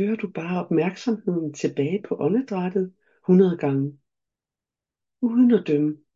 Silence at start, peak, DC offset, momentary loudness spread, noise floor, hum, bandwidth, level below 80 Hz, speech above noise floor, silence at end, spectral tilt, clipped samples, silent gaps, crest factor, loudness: 0 s; -6 dBFS; under 0.1%; 10 LU; -90 dBFS; none; 7.6 kHz; -72 dBFS; 68 dB; 0.2 s; -8 dB/octave; under 0.1%; none; 16 dB; -23 LUFS